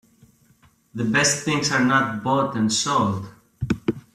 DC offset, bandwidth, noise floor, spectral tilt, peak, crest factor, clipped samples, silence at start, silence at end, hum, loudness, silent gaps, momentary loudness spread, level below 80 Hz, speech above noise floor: under 0.1%; 14 kHz; -58 dBFS; -3.5 dB/octave; -6 dBFS; 16 dB; under 0.1%; 0.95 s; 0.15 s; none; -21 LUFS; none; 13 LU; -52 dBFS; 37 dB